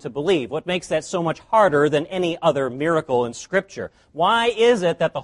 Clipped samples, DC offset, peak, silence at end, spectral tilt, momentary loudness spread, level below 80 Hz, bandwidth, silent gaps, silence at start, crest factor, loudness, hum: under 0.1%; under 0.1%; -4 dBFS; 0 s; -5 dB/octave; 8 LU; -56 dBFS; 11.5 kHz; none; 0.05 s; 16 dB; -20 LUFS; none